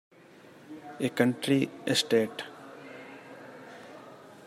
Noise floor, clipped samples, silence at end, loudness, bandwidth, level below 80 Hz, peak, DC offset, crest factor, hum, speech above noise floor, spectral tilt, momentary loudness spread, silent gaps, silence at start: -54 dBFS; under 0.1%; 0.3 s; -28 LUFS; 15.5 kHz; -78 dBFS; -10 dBFS; under 0.1%; 22 dB; none; 26 dB; -4.5 dB/octave; 22 LU; none; 0.7 s